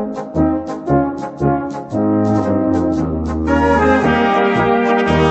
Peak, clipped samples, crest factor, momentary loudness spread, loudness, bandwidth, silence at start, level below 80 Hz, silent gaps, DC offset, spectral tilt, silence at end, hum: -2 dBFS; under 0.1%; 14 dB; 7 LU; -16 LUFS; 8.4 kHz; 0 s; -32 dBFS; none; under 0.1%; -7.5 dB/octave; 0 s; none